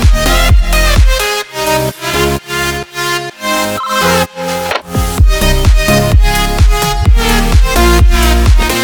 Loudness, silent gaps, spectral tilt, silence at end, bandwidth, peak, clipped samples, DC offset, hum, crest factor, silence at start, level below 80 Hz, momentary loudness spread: -11 LUFS; none; -4.5 dB/octave; 0 s; over 20 kHz; 0 dBFS; 0.4%; under 0.1%; none; 10 dB; 0 s; -12 dBFS; 6 LU